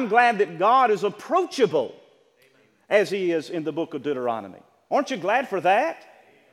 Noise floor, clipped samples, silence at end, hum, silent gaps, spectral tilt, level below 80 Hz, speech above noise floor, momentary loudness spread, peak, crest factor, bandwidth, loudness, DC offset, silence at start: -60 dBFS; under 0.1%; 0.55 s; none; none; -5 dB/octave; -82 dBFS; 37 dB; 10 LU; -2 dBFS; 20 dB; 13.5 kHz; -23 LUFS; under 0.1%; 0 s